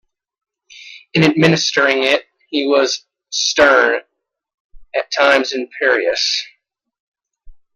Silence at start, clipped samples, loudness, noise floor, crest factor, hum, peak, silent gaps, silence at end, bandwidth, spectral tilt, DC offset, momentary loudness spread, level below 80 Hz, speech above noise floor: 0.75 s; under 0.1%; -15 LUFS; -41 dBFS; 18 dB; none; 0 dBFS; 4.54-4.70 s, 7.00-7.12 s; 0.2 s; 12 kHz; -3.5 dB/octave; under 0.1%; 12 LU; -52 dBFS; 26 dB